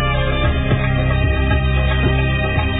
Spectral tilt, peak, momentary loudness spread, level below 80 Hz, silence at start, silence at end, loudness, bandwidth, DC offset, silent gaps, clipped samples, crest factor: -10 dB/octave; -4 dBFS; 1 LU; -20 dBFS; 0 s; 0 s; -17 LUFS; 4 kHz; under 0.1%; none; under 0.1%; 12 dB